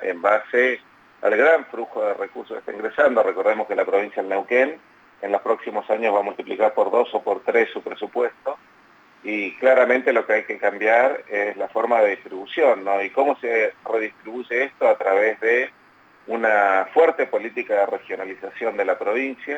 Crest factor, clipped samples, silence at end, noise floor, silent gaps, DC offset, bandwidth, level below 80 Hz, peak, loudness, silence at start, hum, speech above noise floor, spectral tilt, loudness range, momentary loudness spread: 16 dB; under 0.1%; 0 s; -53 dBFS; none; under 0.1%; 7.8 kHz; -74 dBFS; -4 dBFS; -21 LUFS; 0 s; none; 32 dB; -5 dB/octave; 2 LU; 12 LU